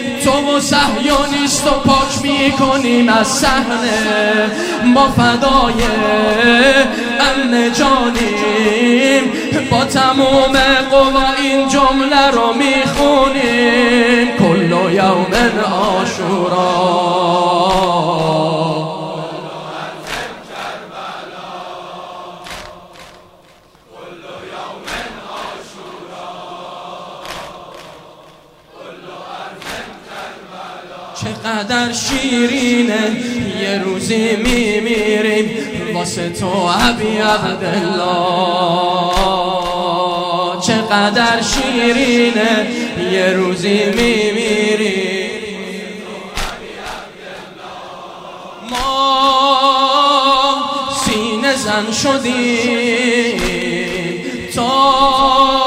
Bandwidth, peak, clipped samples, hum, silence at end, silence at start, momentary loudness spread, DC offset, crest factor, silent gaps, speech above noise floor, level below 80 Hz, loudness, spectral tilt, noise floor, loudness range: 16 kHz; 0 dBFS; under 0.1%; none; 0 s; 0 s; 19 LU; under 0.1%; 14 dB; none; 33 dB; -34 dBFS; -13 LUFS; -4 dB/octave; -46 dBFS; 18 LU